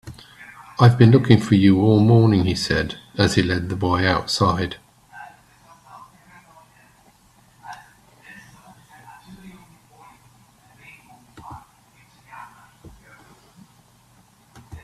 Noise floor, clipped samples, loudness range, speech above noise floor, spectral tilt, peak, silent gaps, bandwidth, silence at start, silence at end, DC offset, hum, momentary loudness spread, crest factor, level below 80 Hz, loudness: -55 dBFS; under 0.1%; 11 LU; 39 dB; -6.5 dB/octave; 0 dBFS; none; 12.5 kHz; 0.05 s; 0.05 s; under 0.1%; none; 28 LU; 22 dB; -50 dBFS; -17 LUFS